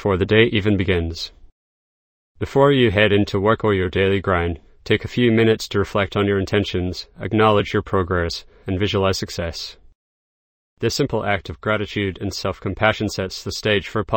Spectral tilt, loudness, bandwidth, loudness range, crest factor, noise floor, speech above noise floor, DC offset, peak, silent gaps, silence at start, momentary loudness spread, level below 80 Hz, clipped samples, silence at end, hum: -6 dB/octave; -20 LUFS; 16.5 kHz; 6 LU; 20 dB; under -90 dBFS; over 71 dB; under 0.1%; 0 dBFS; 1.52-2.35 s, 9.95-10.77 s; 0 s; 11 LU; -42 dBFS; under 0.1%; 0 s; none